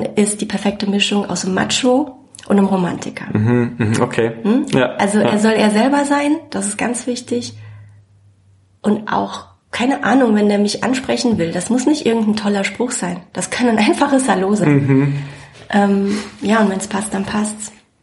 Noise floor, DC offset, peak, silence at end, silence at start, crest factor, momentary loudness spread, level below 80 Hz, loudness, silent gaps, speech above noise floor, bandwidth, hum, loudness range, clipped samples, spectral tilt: -52 dBFS; under 0.1%; -2 dBFS; 0.35 s; 0 s; 16 dB; 9 LU; -52 dBFS; -16 LUFS; none; 36 dB; 11.5 kHz; none; 4 LU; under 0.1%; -5 dB/octave